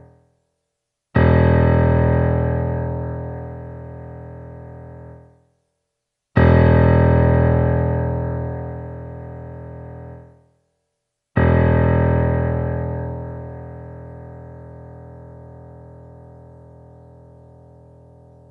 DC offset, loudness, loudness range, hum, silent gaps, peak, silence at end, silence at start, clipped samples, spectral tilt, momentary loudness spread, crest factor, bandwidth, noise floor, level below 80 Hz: under 0.1%; -18 LUFS; 19 LU; none; none; 0 dBFS; 2.8 s; 1.15 s; under 0.1%; -11.5 dB/octave; 25 LU; 20 dB; 4.7 kHz; -79 dBFS; -30 dBFS